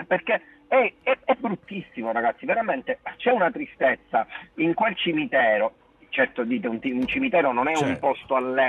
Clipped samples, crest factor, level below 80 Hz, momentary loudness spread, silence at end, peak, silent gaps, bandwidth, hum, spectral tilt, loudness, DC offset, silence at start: under 0.1%; 16 dB; -60 dBFS; 7 LU; 0 s; -8 dBFS; none; 10 kHz; none; -5.5 dB/octave; -24 LUFS; under 0.1%; 0 s